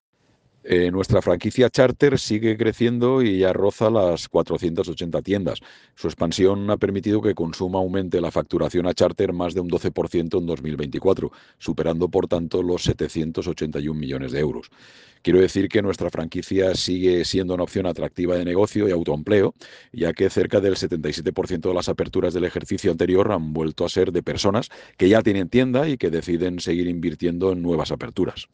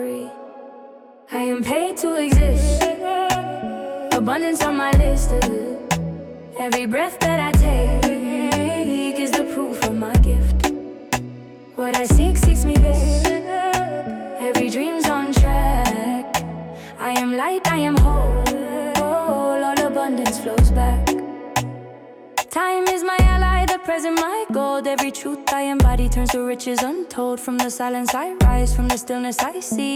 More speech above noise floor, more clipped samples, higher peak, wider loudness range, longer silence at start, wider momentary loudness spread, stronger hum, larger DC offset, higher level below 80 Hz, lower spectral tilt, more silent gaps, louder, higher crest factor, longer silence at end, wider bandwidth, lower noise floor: first, 40 dB vs 25 dB; neither; about the same, -4 dBFS vs -6 dBFS; about the same, 4 LU vs 2 LU; first, 0.65 s vs 0 s; second, 8 LU vs 11 LU; neither; neither; second, -46 dBFS vs -22 dBFS; about the same, -6 dB/octave vs -5.5 dB/octave; neither; about the same, -22 LUFS vs -20 LUFS; about the same, 18 dB vs 14 dB; about the same, 0.1 s vs 0 s; second, 9.6 kHz vs 17 kHz; first, -62 dBFS vs -43 dBFS